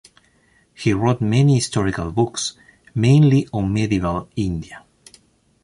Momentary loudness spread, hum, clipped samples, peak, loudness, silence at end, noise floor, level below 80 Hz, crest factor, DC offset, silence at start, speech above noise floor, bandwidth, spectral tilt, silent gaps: 12 LU; none; under 0.1%; -4 dBFS; -19 LUFS; 0.85 s; -58 dBFS; -42 dBFS; 16 dB; under 0.1%; 0.8 s; 40 dB; 11.5 kHz; -6.5 dB/octave; none